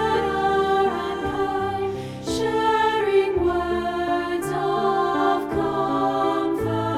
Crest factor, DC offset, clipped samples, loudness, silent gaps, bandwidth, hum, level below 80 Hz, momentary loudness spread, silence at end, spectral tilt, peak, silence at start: 14 dB; under 0.1%; under 0.1%; -22 LUFS; none; 14.5 kHz; none; -44 dBFS; 6 LU; 0 s; -5.5 dB/octave; -8 dBFS; 0 s